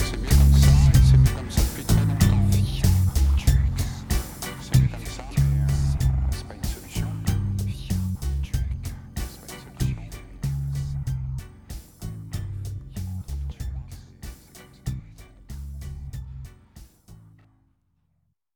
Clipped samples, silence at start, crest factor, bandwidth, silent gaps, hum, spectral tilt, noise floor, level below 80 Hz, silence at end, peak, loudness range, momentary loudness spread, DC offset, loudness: under 0.1%; 0 s; 18 dB; 20 kHz; none; none; -6 dB/octave; -71 dBFS; -26 dBFS; 1.4 s; -4 dBFS; 19 LU; 21 LU; under 0.1%; -24 LUFS